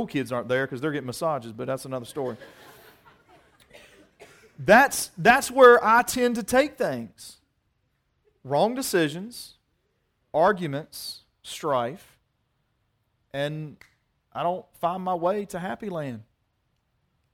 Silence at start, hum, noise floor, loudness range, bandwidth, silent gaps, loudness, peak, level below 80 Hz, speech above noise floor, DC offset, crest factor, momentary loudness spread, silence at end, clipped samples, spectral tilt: 0 s; none; -73 dBFS; 14 LU; 17 kHz; none; -24 LUFS; -2 dBFS; -60 dBFS; 49 dB; under 0.1%; 24 dB; 21 LU; 1.1 s; under 0.1%; -4 dB/octave